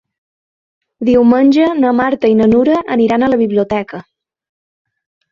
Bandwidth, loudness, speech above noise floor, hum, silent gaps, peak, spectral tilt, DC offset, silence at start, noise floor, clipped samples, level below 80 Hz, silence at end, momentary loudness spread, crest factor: 7 kHz; -12 LUFS; over 79 dB; none; none; -2 dBFS; -7.5 dB/octave; under 0.1%; 1 s; under -90 dBFS; under 0.1%; -48 dBFS; 1.3 s; 10 LU; 12 dB